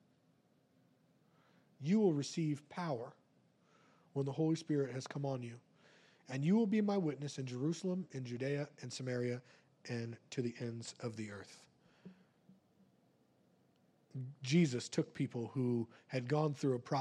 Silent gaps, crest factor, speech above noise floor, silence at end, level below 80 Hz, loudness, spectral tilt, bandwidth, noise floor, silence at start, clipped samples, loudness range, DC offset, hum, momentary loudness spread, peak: none; 18 dB; 36 dB; 0 s; -86 dBFS; -39 LUFS; -6.5 dB/octave; 11 kHz; -73 dBFS; 1.8 s; under 0.1%; 10 LU; under 0.1%; none; 14 LU; -22 dBFS